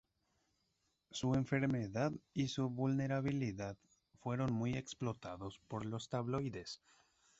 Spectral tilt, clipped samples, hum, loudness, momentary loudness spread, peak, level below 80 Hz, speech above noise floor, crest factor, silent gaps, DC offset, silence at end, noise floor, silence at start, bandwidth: -6.5 dB/octave; under 0.1%; none; -40 LUFS; 12 LU; -22 dBFS; -66 dBFS; 43 dB; 18 dB; none; under 0.1%; 0.65 s; -83 dBFS; 1.15 s; 8 kHz